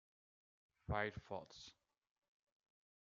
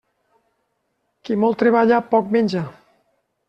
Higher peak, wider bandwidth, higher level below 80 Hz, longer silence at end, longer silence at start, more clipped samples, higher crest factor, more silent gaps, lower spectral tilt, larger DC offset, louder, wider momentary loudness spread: second, -26 dBFS vs -4 dBFS; about the same, 7.2 kHz vs 7.6 kHz; about the same, -66 dBFS vs -64 dBFS; first, 1.3 s vs 0.75 s; second, 0.9 s vs 1.25 s; neither; first, 26 dB vs 18 dB; neither; second, -4 dB/octave vs -7.5 dB/octave; neither; second, -46 LUFS vs -18 LUFS; first, 17 LU vs 13 LU